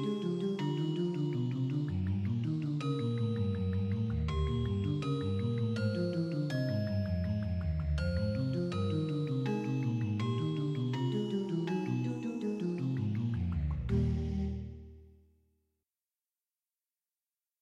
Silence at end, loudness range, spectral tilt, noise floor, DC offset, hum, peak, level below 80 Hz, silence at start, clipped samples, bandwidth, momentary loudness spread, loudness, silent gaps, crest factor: 2.5 s; 3 LU; -8.5 dB/octave; under -90 dBFS; under 0.1%; none; -20 dBFS; -46 dBFS; 0 s; under 0.1%; 9.8 kHz; 2 LU; -34 LUFS; none; 14 dB